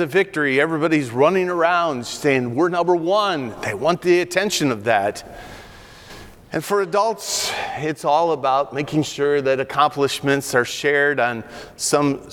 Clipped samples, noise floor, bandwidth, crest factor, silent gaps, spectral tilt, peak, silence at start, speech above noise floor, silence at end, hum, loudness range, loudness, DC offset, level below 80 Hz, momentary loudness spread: under 0.1%; -42 dBFS; 18.5 kHz; 16 dB; none; -4 dB/octave; -4 dBFS; 0 s; 22 dB; 0 s; none; 4 LU; -19 LUFS; under 0.1%; -54 dBFS; 10 LU